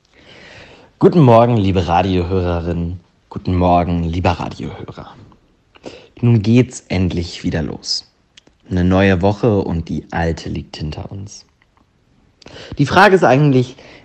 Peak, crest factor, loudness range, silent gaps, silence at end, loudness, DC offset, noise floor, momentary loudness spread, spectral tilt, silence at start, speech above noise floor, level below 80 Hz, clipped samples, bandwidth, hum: 0 dBFS; 16 dB; 5 LU; none; 0.3 s; -15 LUFS; under 0.1%; -56 dBFS; 21 LU; -7 dB/octave; 0.55 s; 41 dB; -42 dBFS; under 0.1%; 9 kHz; none